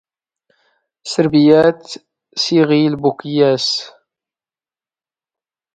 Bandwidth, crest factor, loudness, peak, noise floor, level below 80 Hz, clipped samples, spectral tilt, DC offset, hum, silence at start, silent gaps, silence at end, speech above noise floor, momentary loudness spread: 9.2 kHz; 16 dB; -14 LUFS; 0 dBFS; under -90 dBFS; -58 dBFS; under 0.1%; -5.5 dB/octave; under 0.1%; none; 1.05 s; none; 1.85 s; over 76 dB; 22 LU